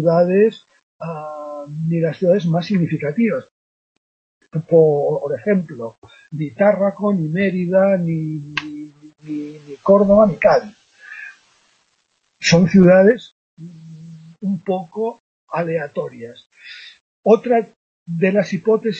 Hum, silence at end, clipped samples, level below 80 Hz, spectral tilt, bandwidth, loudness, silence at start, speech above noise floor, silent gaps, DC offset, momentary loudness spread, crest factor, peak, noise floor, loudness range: none; 0 s; under 0.1%; -54 dBFS; -7 dB/octave; 7.6 kHz; -17 LUFS; 0 s; 49 dB; 0.83-0.99 s, 3.51-4.41 s, 5.98-6.02 s, 13.32-13.57 s, 15.20-15.47 s, 17.01-17.23 s, 17.76-18.06 s; under 0.1%; 22 LU; 18 dB; -2 dBFS; -66 dBFS; 5 LU